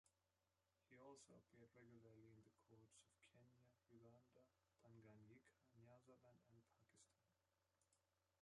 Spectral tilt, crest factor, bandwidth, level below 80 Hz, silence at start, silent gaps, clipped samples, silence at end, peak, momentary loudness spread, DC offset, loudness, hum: -5 dB/octave; 20 dB; 10.5 kHz; under -90 dBFS; 0.05 s; none; under 0.1%; 0 s; -54 dBFS; 3 LU; under 0.1%; -69 LUFS; none